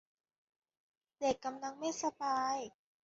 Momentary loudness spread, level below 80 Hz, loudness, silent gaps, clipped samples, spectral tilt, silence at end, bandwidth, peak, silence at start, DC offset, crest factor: 6 LU; -76 dBFS; -38 LUFS; none; under 0.1%; -2 dB/octave; 0.35 s; 7.6 kHz; -20 dBFS; 1.2 s; under 0.1%; 20 dB